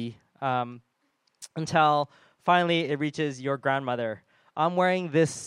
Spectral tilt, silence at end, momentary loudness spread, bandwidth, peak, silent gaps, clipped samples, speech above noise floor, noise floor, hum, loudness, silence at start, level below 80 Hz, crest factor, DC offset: -5 dB/octave; 0 s; 15 LU; 12.5 kHz; -8 dBFS; none; under 0.1%; 47 dB; -73 dBFS; none; -26 LUFS; 0 s; -74 dBFS; 20 dB; under 0.1%